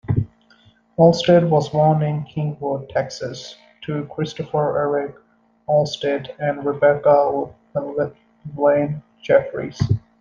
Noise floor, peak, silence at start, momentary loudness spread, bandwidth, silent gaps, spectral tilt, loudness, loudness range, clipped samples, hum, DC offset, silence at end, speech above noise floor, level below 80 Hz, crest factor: -54 dBFS; -2 dBFS; 0.05 s; 16 LU; 7.4 kHz; none; -7 dB/octave; -20 LUFS; 5 LU; under 0.1%; none; under 0.1%; 0.2 s; 35 dB; -50 dBFS; 18 dB